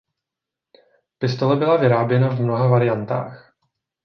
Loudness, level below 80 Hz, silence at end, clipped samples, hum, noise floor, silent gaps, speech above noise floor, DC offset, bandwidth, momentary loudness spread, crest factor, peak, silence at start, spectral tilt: -19 LUFS; -62 dBFS; 0.65 s; under 0.1%; none; -86 dBFS; none; 68 dB; under 0.1%; 6.4 kHz; 10 LU; 16 dB; -4 dBFS; 1.2 s; -9 dB/octave